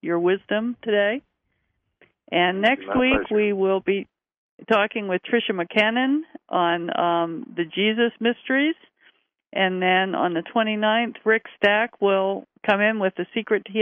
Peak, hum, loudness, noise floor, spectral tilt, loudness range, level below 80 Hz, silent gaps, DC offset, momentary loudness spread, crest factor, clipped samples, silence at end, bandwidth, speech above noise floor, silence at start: -4 dBFS; none; -22 LUFS; -73 dBFS; -7 dB/octave; 2 LU; -56 dBFS; 4.37-4.58 s; under 0.1%; 7 LU; 18 dB; under 0.1%; 0 s; 6.4 kHz; 52 dB; 0.05 s